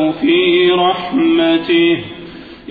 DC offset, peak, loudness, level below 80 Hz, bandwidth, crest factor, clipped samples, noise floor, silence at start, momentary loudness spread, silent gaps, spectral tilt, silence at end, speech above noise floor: under 0.1%; -2 dBFS; -13 LUFS; -50 dBFS; 4.9 kHz; 12 dB; under 0.1%; -33 dBFS; 0 s; 20 LU; none; -8 dB/octave; 0 s; 20 dB